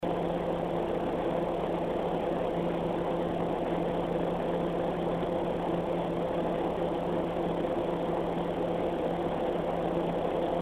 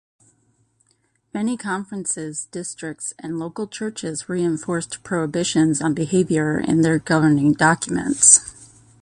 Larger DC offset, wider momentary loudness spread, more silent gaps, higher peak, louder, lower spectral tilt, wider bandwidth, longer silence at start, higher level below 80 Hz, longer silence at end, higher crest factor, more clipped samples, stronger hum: neither; second, 1 LU vs 15 LU; neither; second, -16 dBFS vs 0 dBFS; second, -31 LUFS vs -20 LUFS; first, -8 dB/octave vs -4 dB/octave; about the same, 12 kHz vs 11.5 kHz; second, 0 s vs 1.35 s; first, -50 dBFS vs -56 dBFS; second, 0 s vs 0.4 s; second, 14 dB vs 22 dB; neither; neither